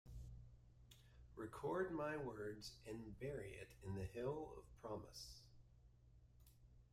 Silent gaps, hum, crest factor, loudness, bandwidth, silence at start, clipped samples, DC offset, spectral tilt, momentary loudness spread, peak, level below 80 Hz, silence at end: none; none; 20 dB; -50 LUFS; 16 kHz; 0.05 s; under 0.1%; under 0.1%; -6 dB/octave; 22 LU; -32 dBFS; -66 dBFS; 0.05 s